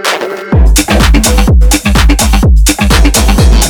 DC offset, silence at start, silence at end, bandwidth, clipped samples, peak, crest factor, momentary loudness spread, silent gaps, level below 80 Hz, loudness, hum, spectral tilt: under 0.1%; 0 s; 0 s; 19.5 kHz; 1%; 0 dBFS; 6 dB; 3 LU; none; -8 dBFS; -8 LUFS; none; -4 dB/octave